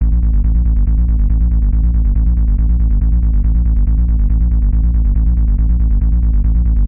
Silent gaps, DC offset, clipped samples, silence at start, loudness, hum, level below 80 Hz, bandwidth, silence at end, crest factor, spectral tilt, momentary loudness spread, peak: none; 0.4%; under 0.1%; 0 s; -15 LUFS; none; -12 dBFS; 1.4 kHz; 0 s; 8 dB; -14.5 dB/octave; 0 LU; -4 dBFS